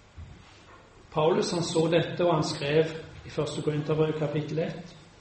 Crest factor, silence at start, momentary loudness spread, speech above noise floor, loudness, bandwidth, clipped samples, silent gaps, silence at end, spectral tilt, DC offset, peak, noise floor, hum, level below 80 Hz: 18 dB; 0.15 s; 17 LU; 25 dB; -28 LUFS; 8.8 kHz; under 0.1%; none; 0.15 s; -5.5 dB/octave; under 0.1%; -10 dBFS; -52 dBFS; none; -58 dBFS